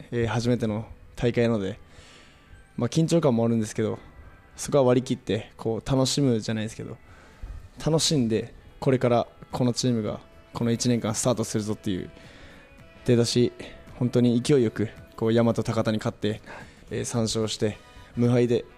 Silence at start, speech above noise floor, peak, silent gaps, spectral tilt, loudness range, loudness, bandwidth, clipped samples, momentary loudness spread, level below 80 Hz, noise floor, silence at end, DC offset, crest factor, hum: 0 s; 26 dB; -10 dBFS; none; -5.5 dB/octave; 3 LU; -25 LUFS; 14.5 kHz; under 0.1%; 18 LU; -50 dBFS; -51 dBFS; 0.1 s; under 0.1%; 16 dB; none